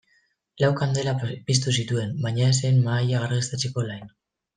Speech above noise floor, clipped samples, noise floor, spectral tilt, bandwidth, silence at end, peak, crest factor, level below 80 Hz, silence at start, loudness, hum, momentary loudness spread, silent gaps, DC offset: 43 dB; under 0.1%; -66 dBFS; -5 dB/octave; 9.8 kHz; 0.5 s; -6 dBFS; 18 dB; -60 dBFS; 0.6 s; -24 LUFS; none; 7 LU; none; under 0.1%